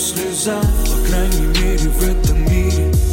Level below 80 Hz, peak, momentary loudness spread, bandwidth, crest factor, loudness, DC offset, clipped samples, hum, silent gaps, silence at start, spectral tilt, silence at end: -16 dBFS; -4 dBFS; 2 LU; 17 kHz; 10 dB; -17 LUFS; under 0.1%; under 0.1%; none; none; 0 s; -4.5 dB/octave; 0 s